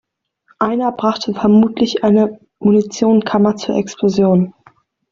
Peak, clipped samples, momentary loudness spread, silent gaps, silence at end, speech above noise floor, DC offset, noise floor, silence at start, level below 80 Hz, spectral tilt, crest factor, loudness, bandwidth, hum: 0 dBFS; under 0.1%; 7 LU; none; 0.6 s; 43 dB; under 0.1%; -57 dBFS; 0.6 s; -54 dBFS; -7 dB/octave; 14 dB; -15 LUFS; 7.4 kHz; none